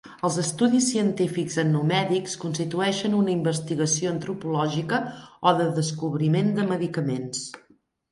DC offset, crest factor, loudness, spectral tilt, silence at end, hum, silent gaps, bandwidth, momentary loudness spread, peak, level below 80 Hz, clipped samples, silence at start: under 0.1%; 18 dB; -24 LUFS; -5 dB/octave; 0.55 s; none; none; 11.5 kHz; 7 LU; -6 dBFS; -66 dBFS; under 0.1%; 0.05 s